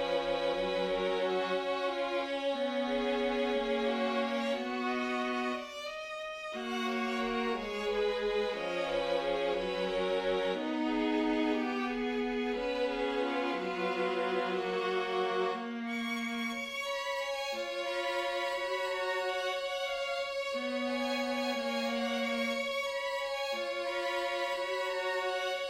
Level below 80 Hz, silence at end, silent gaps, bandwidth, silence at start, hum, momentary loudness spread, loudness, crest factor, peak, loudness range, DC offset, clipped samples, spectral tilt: -62 dBFS; 0 s; none; 15.5 kHz; 0 s; none; 3 LU; -33 LUFS; 14 dB; -20 dBFS; 2 LU; under 0.1%; under 0.1%; -3.5 dB/octave